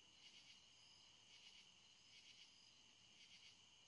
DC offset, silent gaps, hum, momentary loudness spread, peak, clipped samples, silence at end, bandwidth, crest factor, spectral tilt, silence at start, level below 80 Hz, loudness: under 0.1%; none; none; 4 LU; -52 dBFS; under 0.1%; 0 s; 11 kHz; 16 dB; 0 dB/octave; 0 s; under -90 dBFS; -65 LUFS